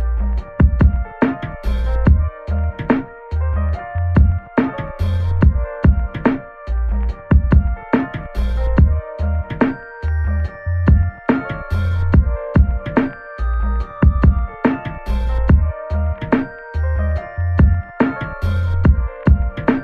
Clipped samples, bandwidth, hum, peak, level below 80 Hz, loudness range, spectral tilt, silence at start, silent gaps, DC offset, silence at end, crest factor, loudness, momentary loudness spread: under 0.1%; 4.8 kHz; none; -2 dBFS; -18 dBFS; 2 LU; -10 dB/octave; 0 s; none; under 0.1%; 0 s; 16 dB; -18 LUFS; 8 LU